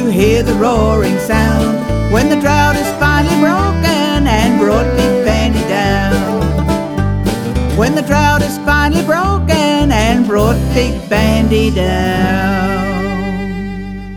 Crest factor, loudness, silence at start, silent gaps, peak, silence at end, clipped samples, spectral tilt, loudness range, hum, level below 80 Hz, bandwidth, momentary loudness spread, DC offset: 12 dB; -13 LUFS; 0 s; none; 0 dBFS; 0 s; under 0.1%; -6 dB/octave; 2 LU; none; -22 dBFS; 18 kHz; 5 LU; under 0.1%